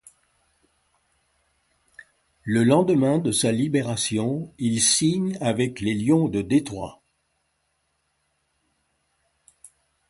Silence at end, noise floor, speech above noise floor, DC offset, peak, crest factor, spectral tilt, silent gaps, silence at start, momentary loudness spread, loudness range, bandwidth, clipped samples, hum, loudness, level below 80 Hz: 3.2 s; -72 dBFS; 51 dB; under 0.1%; -6 dBFS; 20 dB; -4.5 dB/octave; none; 2.45 s; 9 LU; 6 LU; 12 kHz; under 0.1%; none; -22 LUFS; -58 dBFS